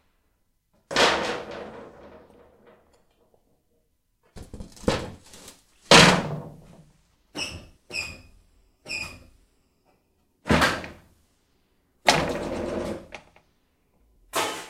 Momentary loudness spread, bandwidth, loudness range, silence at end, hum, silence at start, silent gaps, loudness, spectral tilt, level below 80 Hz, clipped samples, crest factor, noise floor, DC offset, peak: 27 LU; 16 kHz; 15 LU; 0 s; none; 0.9 s; none; -22 LUFS; -3 dB/octave; -48 dBFS; under 0.1%; 28 dB; -70 dBFS; under 0.1%; 0 dBFS